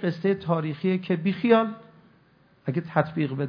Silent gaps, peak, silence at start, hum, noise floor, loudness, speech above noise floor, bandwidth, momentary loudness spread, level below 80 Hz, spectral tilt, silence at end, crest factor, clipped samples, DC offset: none; -4 dBFS; 0 s; none; -60 dBFS; -25 LUFS; 35 dB; 5.4 kHz; 10 LU; -68 dBFS; -9.5 dB/octave; 0 s; 20 dB; under 0.1%; under 0.1%